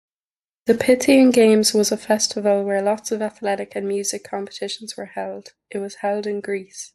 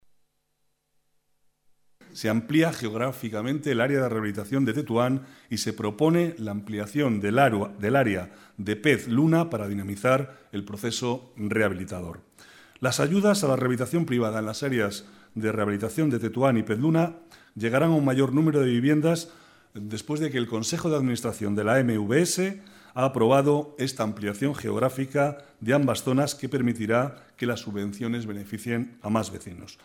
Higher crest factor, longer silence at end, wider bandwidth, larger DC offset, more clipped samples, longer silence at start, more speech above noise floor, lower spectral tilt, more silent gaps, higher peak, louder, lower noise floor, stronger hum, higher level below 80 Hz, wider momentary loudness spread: about the same, 16 dB vs 20 dB; about the same, 0.05 s vs 0.1 s; second, 12.5 kHz vs 16.5 kHz; neither; neither; second, 0.65 s vs 2.15 s; first, over 70 dB vs 48 dB; second, -3.5 dB/octave vs -6 dB/octave; neither; about the same, -4 dBFS vs -6 dBFS; first, -20 LUFS vs -26 LUFS; first, under -90 dBFS vs -73 dBFS; neither; about the same, -64 dBFS vs -64 dBFS; first, 16 LU vs 11 LU